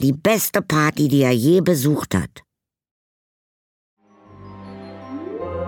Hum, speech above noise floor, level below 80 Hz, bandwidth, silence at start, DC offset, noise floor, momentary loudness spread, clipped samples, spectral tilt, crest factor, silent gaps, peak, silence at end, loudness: none; 27 dB; -52 dBFS; 19 kHz; 0 s; under 0.1%; -45 dBFS; 21 LU; under 0.1%; -5.5 dB/octave; 18 dB; 2.91-3.97 s; -4 dBFS; 0 s; -18 LUFS